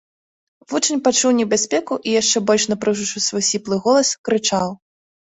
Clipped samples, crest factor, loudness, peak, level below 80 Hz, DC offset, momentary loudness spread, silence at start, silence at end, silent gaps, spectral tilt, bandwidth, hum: under 0.1%; 16 dB; -18 LUFS; -4 dBFS; -60 dBFS; under 0.1%; 5 LU; 0.7 s; 0.55 s; 4.18-4.24 s; -2.5 dB/octave; 8.4 kHz; none